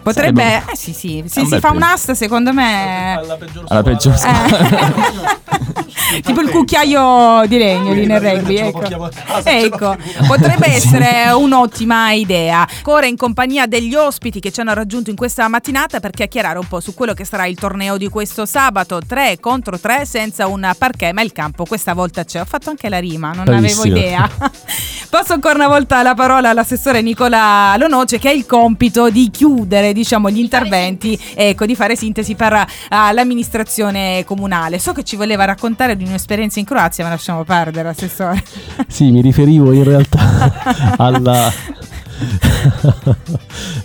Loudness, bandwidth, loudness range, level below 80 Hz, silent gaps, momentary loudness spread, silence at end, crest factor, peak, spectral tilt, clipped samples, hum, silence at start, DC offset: -13 LUFS; over 20 kHz; 6 LU; -32 dBFS; none; 10 LU; 0 s; 12 dB; 0 dBFS; -5 dB/octave; under 0.1%; none; 0.05 s; under 0.1%